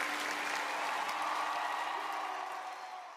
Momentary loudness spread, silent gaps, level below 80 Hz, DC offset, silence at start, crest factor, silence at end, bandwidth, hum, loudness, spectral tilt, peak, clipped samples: 7 LU; none; -84 dBFS; under 0.1%; 0 s; 16 dB; 0 s; 15.5 kHz; none; -36 LUFS; 0 dB/octave; -20 dBFS; under 0.1%